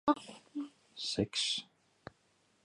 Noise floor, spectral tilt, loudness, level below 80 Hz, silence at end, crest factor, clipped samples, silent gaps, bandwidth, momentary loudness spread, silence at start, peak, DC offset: -73 dBFS; -3.5 dB/octave; -36 LUFS; -68 dBFS; 1 s; 24 dB; under 0.1%; none; 11.5 kHz; 23 LU; 0.05 s; -16 dBFS; under 0.1%